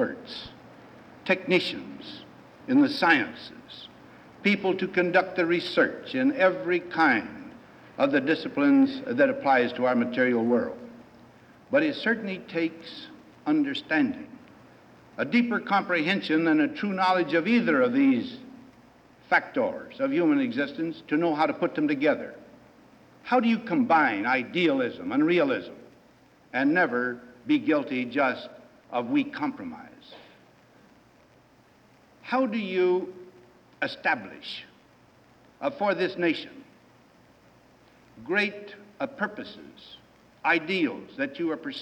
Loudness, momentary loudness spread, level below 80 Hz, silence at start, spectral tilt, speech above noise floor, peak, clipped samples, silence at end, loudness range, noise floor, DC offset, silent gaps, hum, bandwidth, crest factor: -25 LUFS; 19 LU; -70 dBFS; 0 s; -6.5 dB/octave; 33 dB; -8 dBFS; under 0.1%; 0 s; 8 LU; -58 dBFS; under 0.1%; none; none; 9 kHz; 20 dB